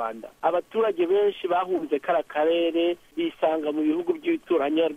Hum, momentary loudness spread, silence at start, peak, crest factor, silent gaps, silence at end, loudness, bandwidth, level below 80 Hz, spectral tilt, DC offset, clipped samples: none; 5 LU; 0 s; -10 dBFS; 14 dB; none; 0 s; -25 LUFS; 9.6 kHz; -68 dBFS; -6 dB/octave; under 0.1%; under 0.1%